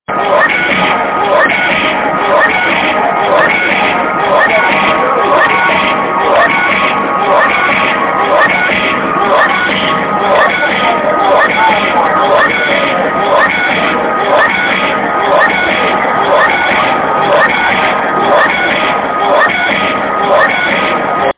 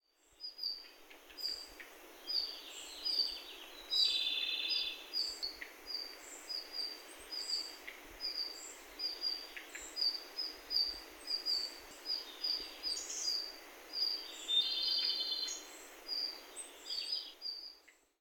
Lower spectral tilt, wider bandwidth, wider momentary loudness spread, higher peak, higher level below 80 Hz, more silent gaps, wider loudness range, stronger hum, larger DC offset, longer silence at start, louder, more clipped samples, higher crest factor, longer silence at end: first, -7.5 dB/octave vs 1.5 dB/octave; second, 4 kHz vs 18 kHz; second, 3 LU vs 17 LU; first, 0 dBFS vs -20 dBFS; first, -44 dBFS vs -72 dBFS; neither; second, 1 LU vs 6 LU; neither; neither; second, 0.1 s vs 0.4 s; first, -9 LUFS vs -37 LUFS; neither; second, 10 dB vs 22 dB; second, 0.05 s vs 0.3 s